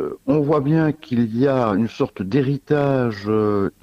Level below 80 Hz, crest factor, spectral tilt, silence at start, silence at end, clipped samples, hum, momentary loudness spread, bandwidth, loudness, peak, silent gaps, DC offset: -52 dBFS; 14 dB; -9 dB/octave; 0 s; 0.1 s; under 0.1%; none; 4 LU; 8.6 kHz; -20 LUFS; -4 dBFS; none; under 0.1%